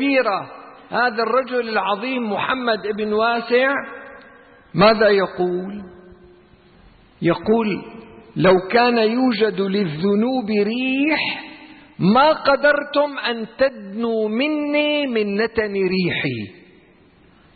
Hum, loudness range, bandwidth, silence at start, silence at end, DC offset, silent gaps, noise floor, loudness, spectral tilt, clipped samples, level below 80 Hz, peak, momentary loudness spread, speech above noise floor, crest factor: none; 3 LU; 4.8 kHz; 0 s; 1.05 s; under 0.1%; none; -52 dBFS; -19 LUFS; -10.5 dB/octave; under 0.1%; -54 dBFS; -4 dBFS; 11 LU; 33 dB; 16 dB